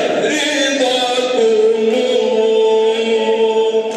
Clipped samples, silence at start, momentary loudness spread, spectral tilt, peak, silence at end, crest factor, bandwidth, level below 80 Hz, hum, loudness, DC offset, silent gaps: under 0.1%; 0 s; 3 LU; -2.5 dB/octave; -4 dBFS; 0 s; 10 dB; 11.5 kHz; -74 dBFS; none; -14 LUFS; under 0.1%; none